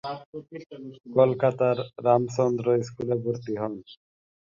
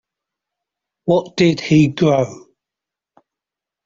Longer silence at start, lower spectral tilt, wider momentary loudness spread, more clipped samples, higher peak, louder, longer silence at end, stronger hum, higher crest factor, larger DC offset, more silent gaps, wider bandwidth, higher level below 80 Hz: second, 0.05 s vs 1.05 s; about the same, -7.5 dB/octave vs -6.5 dB/octave; first, 19 LU vs 9 LU; neither; second, -6 dBFS vs -2 dBFS; second, -25 LUFS vs -16 LUFS; second, 0.65 s vs 1.45 s; neither; about the same, 20 dB vs 16 dB; neither; first, 0.25-0.33 s vs none; about the same, 7.6 kHz vs 7.6 kHz; second, -66 dBFS vs -54 dBFS